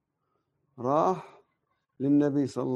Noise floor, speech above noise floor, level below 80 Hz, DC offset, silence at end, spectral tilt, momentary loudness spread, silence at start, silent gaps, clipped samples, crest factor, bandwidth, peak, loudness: -78 dBFS; 52 dB; -74 dBFS; under 0.1%; 0 s; -8 dB/octave; 10 LU; 0.8 s; none; under 0.1%; 18 dB; 9 kHz; -12 dBFS; -27 LUFS